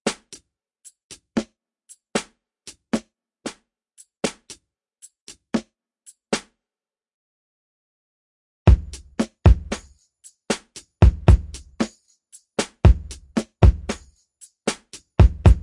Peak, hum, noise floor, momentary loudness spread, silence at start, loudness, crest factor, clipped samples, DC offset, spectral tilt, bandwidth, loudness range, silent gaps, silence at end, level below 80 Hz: 0 dBFS; none; under -90 dBFS; 20 LU; 0.05 s; -22 LUFS; 22 dB; under 0.1%; under 0.1%; -6 dB/octave; 11.5 kHz; 13 LU; 1.04-1.10 s, 5.21-5.27 s, 7.14-8.66 s; 0.05 s; -26 dBFS